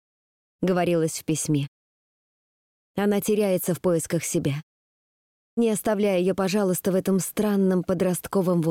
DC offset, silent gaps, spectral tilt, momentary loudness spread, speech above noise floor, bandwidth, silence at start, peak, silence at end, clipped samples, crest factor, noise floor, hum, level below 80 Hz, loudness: under 0.1%; 1.68-2.94 s, 4.63-5.57 s; -5.5 dB/octave; 5 LU; over 67 dB; 17 kHz; 0.6 s; -14 dBFS; 0 s; under 0.1%; 12 dB; under -90 dBFS; none; -60 dBFS; -24 LUFS